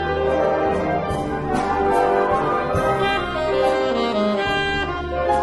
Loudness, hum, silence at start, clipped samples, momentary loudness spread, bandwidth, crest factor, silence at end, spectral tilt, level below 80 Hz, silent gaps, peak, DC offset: -20 LUFS; none; 0 s; under 0.1%; 5 LU; 12 kHz; 14 dB; 0 s; -6 dB/octave; -38 dBFS; none; -6 dBFS; under 0.1%